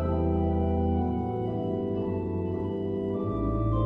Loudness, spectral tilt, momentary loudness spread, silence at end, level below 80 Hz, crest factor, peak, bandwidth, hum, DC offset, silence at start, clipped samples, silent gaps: -29 LUFS; -11.5 dB/octave; 4 LU; 0 s; -36 dBFS; 12 dB; -16 dBFS; 3.9 kHz; none; under 0.1%; 0 s; under 0.1%; none